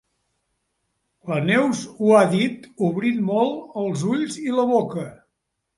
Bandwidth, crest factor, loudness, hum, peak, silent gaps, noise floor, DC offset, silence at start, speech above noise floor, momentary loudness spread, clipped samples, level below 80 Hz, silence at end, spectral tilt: 11.5 kHz; 20 dB; -21 LUFS; none; -4 dBFS; none; -77 dBFS; under 0.1%; 1.25 s; 57 dB; 11 LU; under 0.1%; -66 dBFS; 0.65 s; -6 dB/octave